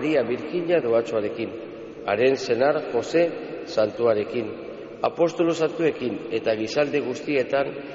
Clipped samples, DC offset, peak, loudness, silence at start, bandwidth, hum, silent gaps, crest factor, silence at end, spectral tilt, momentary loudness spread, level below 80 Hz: under 0.1%; under 0.1%; -8 dBFS; -24 LUFS; 0 s; 8 kHz; none; none; 16 dB; 0 s; -4 dB/octave; 11 LU; -64 dBFS